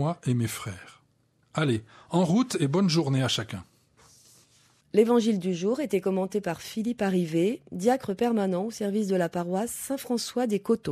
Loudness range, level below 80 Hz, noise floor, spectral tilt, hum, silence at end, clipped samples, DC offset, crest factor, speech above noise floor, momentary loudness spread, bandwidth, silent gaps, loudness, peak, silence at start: 1 LU; -66 dBFS; -67 dBFS; -6 dB/octave; none; 0 s; under 0.1%; under 0.1%; 18 dB; 41 dB; 8 LU; 14.5 kHz; none; -27 LUFS; -8 dBFS; 0 s